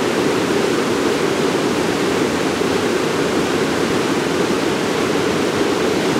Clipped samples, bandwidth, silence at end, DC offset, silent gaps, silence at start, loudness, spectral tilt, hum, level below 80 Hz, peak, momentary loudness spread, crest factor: under 0.1%; 16 kHz; 0 s; under 0.1%; none; 0 s; -18 LUFS; -4.5 dB/octave; none; -50 dBFS; -6 dBFS; 1 LU; 12 dB